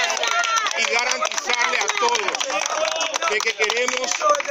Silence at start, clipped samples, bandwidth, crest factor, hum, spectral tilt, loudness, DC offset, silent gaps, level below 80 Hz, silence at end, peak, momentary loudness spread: 0 s; under 0.1%; 17 kHz; 18 dB; none; 2 dB/octave; -20 LUFS; under 0.1%; none; -66 dBFS; 0 s; -2 dBFS; 3 LU